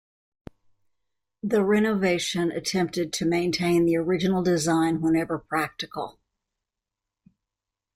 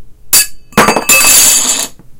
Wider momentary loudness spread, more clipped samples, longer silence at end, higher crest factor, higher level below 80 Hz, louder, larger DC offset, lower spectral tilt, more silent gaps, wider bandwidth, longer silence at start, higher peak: about the same, 9 LU vs 9 LU; second, under 0.1% vs 3%; first, 1.85 s vs 0 s; first, 16 dB vs 10 dB; second, -58 dBFS vs -36 dBFS; second, -24 LUFS vs -6 LUFS; neither; first, -5 dB/octave vs -0.5 dB/octave; neither; second, 15 kHz vs over 20 kHz; first, 1.45 s vs 0 s; second, -10 dBFS vs 0 dBFS